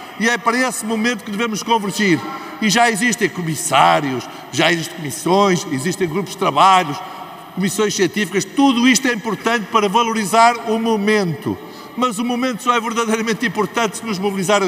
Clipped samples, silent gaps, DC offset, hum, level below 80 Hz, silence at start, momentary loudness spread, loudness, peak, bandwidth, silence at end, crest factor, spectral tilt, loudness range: under 0.1%; none; under 0.1%; none; -62 dBFS; 0 s; 10 LU; -17 LUFS; 0 dBFS; 16 kHz; 0 s; 16 dB; -3.5 dB/octave; 3 LU